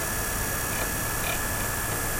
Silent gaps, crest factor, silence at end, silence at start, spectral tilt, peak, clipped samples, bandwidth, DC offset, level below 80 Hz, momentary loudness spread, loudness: none; 14 dB; 0 s; 0 s; -2.5 dB/octave; -14 dBFS; under 0.1%; 16 kHz; under 0.1%; -38 dBFS; 1 LU; -27 LUFS